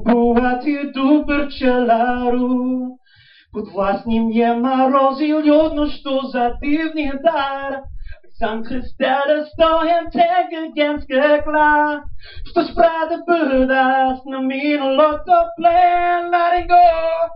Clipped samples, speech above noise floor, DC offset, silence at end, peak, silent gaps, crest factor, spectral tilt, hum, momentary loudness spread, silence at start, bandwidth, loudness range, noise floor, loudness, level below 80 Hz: under 0.1%; 34 dB; under 0.1%; 0 s; -4 dBFS; none; 14 dB; -3 dB/octave; none; 9 LU; 0 s; 5.6 kHz; 4 LU; -50 dBFS; -17 LUFS; -38 dBFS